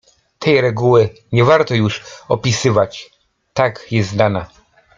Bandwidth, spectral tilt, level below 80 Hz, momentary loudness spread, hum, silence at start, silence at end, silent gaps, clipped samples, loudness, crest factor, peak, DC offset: 7.6 kHz; -5.5 dB/octave; -50 dBFS; 9 LU; none; 0.4 s; 0.5 s; none; under 0.1%; -16 LUFS; 16 dB; 0 dBFS; under 0.1%